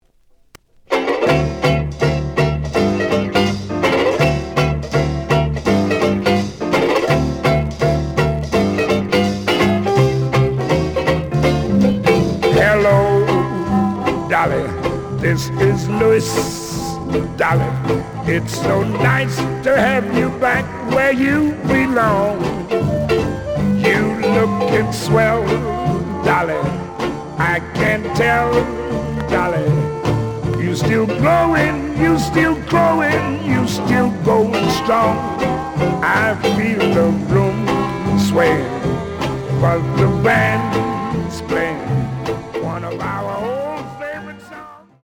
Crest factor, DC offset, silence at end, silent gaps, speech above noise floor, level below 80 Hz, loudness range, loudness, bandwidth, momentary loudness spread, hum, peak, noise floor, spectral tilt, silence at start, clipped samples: 14 dB; under 0.1%; 0.25 s; none; 37 dB; -36 dBFS; 3 LU; -17 LUFS; over 20 kHz; 7 LU; none; -2 dBFS; -52 dBFS; -6.5 dB/octave; 0.9 s; under 0.1%